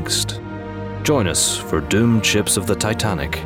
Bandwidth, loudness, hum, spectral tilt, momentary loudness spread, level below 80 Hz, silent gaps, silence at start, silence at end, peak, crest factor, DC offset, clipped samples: 17.5 kHz; -18 LUFS; none; -3.5 dB/octave; 14 LU; -38 dBFS; none; 0 s; 0 s; -4 dBFS; 14 dB; under 0.1%; under 0.1%